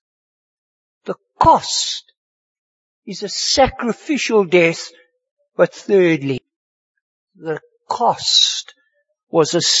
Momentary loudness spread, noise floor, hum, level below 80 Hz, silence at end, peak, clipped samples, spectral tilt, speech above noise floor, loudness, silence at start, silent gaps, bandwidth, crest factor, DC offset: 17 LU; under -90 dBFS; none; -46 dBFS; 0 s; 0 dBFS; under 0.1%; -3 dB/octave; over 74 dB; -16 LUFS; 1.05 s; 2.17-3.02 s, 5.31-5.37 s, 6.56-6.95 s, 7.01-7.27 s, 9.23-9.27 s; 8 kHz; 20 dB; under 0.1%